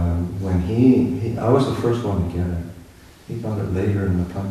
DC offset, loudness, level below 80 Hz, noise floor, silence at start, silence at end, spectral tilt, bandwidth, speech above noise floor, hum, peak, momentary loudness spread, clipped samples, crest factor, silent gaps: under 0.1%; -21 LUFS; -38 dBFS; -45 dBFS; 0 s; 0 s; -8.5 dB/octave; 13.5 kHz; 25 dB; none; -4 dBFS; 12 LU; under 0.1%; 16 dB; none